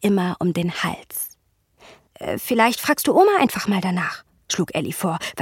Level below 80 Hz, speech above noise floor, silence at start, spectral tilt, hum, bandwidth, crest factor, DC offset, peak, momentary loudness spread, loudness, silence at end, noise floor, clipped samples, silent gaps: -58 dBFS; 39 dB; 0 s; -4.5 dB/octave; none; 17 kHz; 20 dB; under 0.1%; -2 dBFS; 13 LU; -21 LUFS; 0 s; -60 dBFS; under 0.1%; none